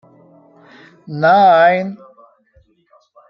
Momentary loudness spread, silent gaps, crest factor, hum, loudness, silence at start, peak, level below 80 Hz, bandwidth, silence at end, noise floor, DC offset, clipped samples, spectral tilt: 19 LU; none; 16 dB; none; -12 LUFS; 1.1 s; -2 dBFS; -66 dBFS; 6 kHz; 1.35 s; -55 dBFS; under 0.1%; under 0.1%; -7.5 dB/octave